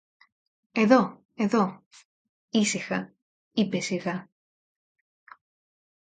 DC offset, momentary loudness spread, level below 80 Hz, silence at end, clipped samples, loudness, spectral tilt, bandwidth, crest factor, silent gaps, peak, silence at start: under 0.1%; 12 LU; -72 dBFS; 1.95 s; under 0.1%; -26 LUFS; -5 dB/octave; 9.6 kHz; 24 dB; 1.25-1.29 s, 1.86-1.91 s, 2.05-2.48 s, 3.22-3.51 s; -6 dBFS; 0.75 s